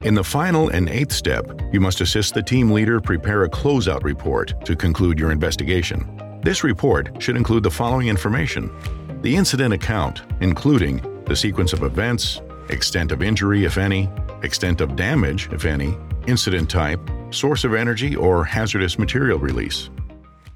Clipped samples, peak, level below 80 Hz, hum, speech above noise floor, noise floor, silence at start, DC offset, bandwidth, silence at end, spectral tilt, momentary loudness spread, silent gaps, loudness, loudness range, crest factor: under 0.1%; -4 dBFS; -30 dBFS; none; 21 dB; -40 dBFS; 0 s; under 0.1%; 17 kHz; 0 s; -5.5 dB/octave; 8 LU; none; -20 LUFS; 2 LU; 16 dB